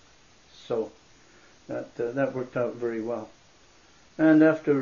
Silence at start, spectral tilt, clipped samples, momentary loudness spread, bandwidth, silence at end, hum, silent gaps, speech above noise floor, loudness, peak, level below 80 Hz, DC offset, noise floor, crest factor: 0.7 s; -7.5 dB/octave; under 0.1%; 18 LU; 7.2 kHz; 0 s; none; none; 33 dB; -26 LUFS; -8 dBFS; -66 dBFS; under 0.1%; -58 dBFS; 20 dB